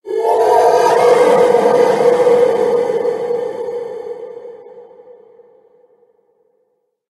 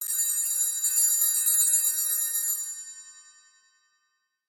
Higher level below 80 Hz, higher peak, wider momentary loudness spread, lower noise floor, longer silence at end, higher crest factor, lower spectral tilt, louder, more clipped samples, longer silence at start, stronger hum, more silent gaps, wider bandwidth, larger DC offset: first, -66 dBFS vs under -90 dBFS; first, 0 dBFS vs -10 dBFS; first, 18 LU vs 15 LU; second, -65 dBFS vs -76 dBFS; first, 2.25 s vs 1.25 s; about the same, 14 dB vs 18 dB; first, -4.5 dB/octave vs 8.5 dB/octave; first, -13 LUFS vs -22 LUFS; neither; about the same, 0.05 s vs 0 s; neither; neither; second, 12.5 kHz vs 17 kHz; neither